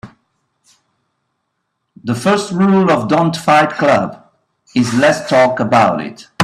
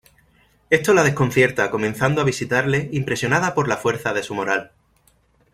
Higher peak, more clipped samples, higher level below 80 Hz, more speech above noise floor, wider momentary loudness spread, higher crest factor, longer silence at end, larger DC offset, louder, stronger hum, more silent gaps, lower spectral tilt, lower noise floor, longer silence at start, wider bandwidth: about the same, 0 dBFS vs -2 dBFS; neither; about the same, -54 dBFS vs -52 dBFS; first, 58 dB vs 40 dB; first, 10 LU vs 7 LU; about the same, 16 dB vs 20 dB; second, 0 s vs 0.85 s; neither; first, -13 LUFS vs -20 LUFS; neither; neither; about the same, -5.5 dB/octave vs -5 dB/octave; first, -71 dBFS vs -60 dBFS; second, 0.05 s vs 0.7 s; second, 13 kHz vs 16 kHz